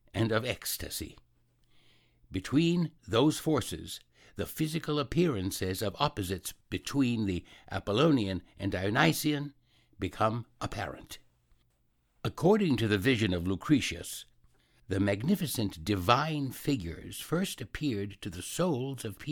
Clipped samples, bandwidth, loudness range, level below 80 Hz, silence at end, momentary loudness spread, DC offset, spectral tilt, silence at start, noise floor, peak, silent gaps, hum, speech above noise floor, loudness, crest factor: under 0.1%; 19 kHz; 3 LU; -54 dBFS; 0 s; 13 LU; under 0.1%; -5.5 dB/octave; 0.15 s; -72 dBFS; -6 dBFS; none; none; 42 dB; -31 LUFS; 24 dB